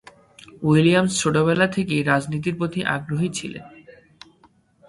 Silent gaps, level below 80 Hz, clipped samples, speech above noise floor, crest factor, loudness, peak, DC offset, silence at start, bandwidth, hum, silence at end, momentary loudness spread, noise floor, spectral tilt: none; -56 dBFS; under 0.1%; 37 dB; 20 dB; -21 LUFS; -2 dBFS; under 0.1%; 0.55 s; 11.5 kHz; none; 0.95 s; 10 LU; -58 dBFS; -5.5 dB/octave